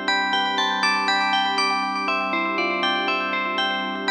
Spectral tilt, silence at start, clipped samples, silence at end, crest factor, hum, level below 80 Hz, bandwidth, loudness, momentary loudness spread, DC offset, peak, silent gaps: -2.5 dB/octave; 0 s; under 0.1%; 0 s; 16 dB; 50 Hz at -70 dBFS; -68 dBFS; 10.5 kHz; -21 LUFS; 3 LU; under 0.1%; -8 dBFS; none